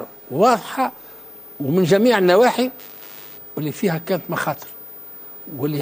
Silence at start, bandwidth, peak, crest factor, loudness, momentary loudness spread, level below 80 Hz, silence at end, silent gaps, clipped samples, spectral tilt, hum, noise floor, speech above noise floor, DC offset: 0 s; 16 kHz; -2 dBFS; 18 dB; -19 LUFS; 21 LU; -64 dBFS; 0 s; none; under 0.1%; -5.5 dB/octave; none; -40 dBFS; 22 dB; under 0.1%